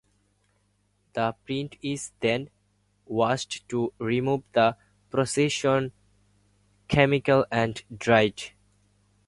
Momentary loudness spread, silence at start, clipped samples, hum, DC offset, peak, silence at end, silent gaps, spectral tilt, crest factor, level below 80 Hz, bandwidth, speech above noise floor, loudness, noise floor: 11 LU; 1.15 s; under 0.1%; 50 Hz at -55 dBFS; under 0.1%; -4 dBFS; 0.8 s; none; -5 dB/octave; 22 dB; -56 dBFS; 11.5 kHz; 44 dB; -26 LUFS; -69 dBFS